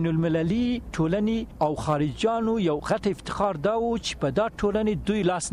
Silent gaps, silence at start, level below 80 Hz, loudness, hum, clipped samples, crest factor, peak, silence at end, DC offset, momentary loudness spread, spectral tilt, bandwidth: none; 0 s; -44 dBFS; -26 LUFS; none; under 0.1%; 14 dB; -12 dBFS; 0 s; under 0.1%; 3 LU; -6 dB/octave; 11.5 kHz